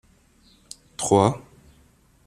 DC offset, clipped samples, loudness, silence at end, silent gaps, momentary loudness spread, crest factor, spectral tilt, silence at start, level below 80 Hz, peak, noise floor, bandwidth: under 0.1%; under 0.1%; -21 LUFS; 0.85 s; none; 25 LU; 24 dB; -5.5 dB/octave; 1 s; -56 dBFS; -2 dBFS; -58 dBFS; 14 kHz